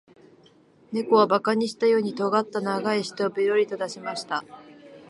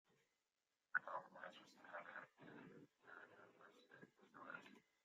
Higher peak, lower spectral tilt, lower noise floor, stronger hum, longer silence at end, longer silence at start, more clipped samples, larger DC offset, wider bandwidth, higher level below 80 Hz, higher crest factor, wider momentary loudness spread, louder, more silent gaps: first, -6 dBFS vs -26 dBFS; first, -5 dB/octave vs -1.5 dB/octave; second, -56 dBFS vs under -90 dBFS; neither; second, 0.1 s vs 0.25 s; first, 0.9 s vs 0.1 s; neither; neither; first, 11.5 kHz vs 7.6 kHz; first, -76 dBFS vs under -90 dBFS; second, 20 dB vs 32 dB; second, 11 LU vs 20 LU; first, -24 LUFS vs -54 LUFS; neither